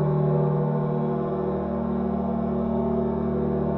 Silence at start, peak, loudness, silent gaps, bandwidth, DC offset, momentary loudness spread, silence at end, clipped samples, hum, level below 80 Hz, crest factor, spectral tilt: 0 s; -12 dBFS; -25 LUFS; none; 4.1 kHz; under 0.1%; 4 LU; 0 s; under 0.1%; none; -42 dBFS; 12 dB; -10.5 dB/octave